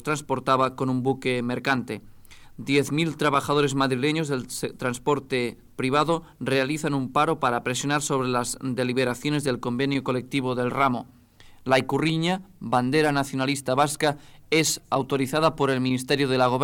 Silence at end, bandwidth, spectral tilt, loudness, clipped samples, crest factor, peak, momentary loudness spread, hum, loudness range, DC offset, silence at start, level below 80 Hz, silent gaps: 0 s; 17.5 kHz; -4.5 dB/octave; -24 LUFS; under 0.1%; 16 dB; -8 dBFS; 6 LU; none; 2 LU; under 0.1%; 0.05 s; -54 dBFS; none